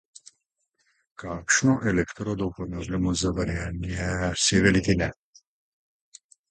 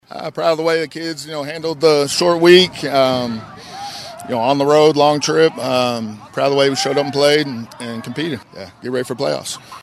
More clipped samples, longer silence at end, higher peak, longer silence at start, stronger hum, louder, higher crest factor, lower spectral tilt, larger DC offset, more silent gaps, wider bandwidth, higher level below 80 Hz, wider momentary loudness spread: neither; first, 1.4 s vs 0.05 s; second, -6 dBFS vs 0 dBFS; first, 1.2 s vs 0.1 s; neither; second, -25 LUFS vs -16 LUFS; about the same, 20 dB vs 16 dB; about the same, -4 dB/octave vs -4.5 dB/octave; neither; neither; second, 9.4 kHz vs 14 kHz; first, -42 dBFS vs -58 dBFS; second, 11 LU vs 17 LU